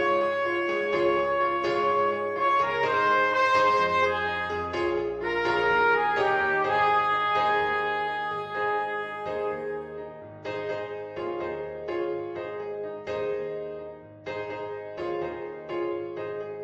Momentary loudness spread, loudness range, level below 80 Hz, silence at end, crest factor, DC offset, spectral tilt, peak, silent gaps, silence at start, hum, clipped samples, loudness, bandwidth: 13 LU; 10 LU; -60 dBFS; 0 s; 16 dB; under 0.1%; -5 dB/octave; -12 dBFS; none; 0 s; none; under 0.1%; -26 LUFS; 9.4 kHz